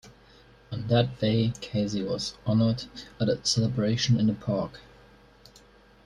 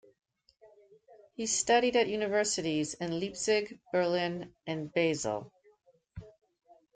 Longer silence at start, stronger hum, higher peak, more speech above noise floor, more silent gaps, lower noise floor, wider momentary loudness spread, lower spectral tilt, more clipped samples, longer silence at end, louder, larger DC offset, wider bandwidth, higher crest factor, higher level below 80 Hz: second, 0.05 s vs 0.65 s; neither; first, -8 dBFS vs -14 dBFS; second, 29 dB vs 35 dB; neither; second, -55 dBFS vs -66 dBFS; second, 9 LU vs 18 LU; first, -6 dB/octave vs -3.5 dB/octave; neither; first, 1.25 s vs 0.65 s; first, -27 LUFS vs -31 LUFS; neither; first, 11 kHz vs 9.6 kHz; about the same, 20 dB vs 20 dB; first, -54 dBFS vs -66 dBFS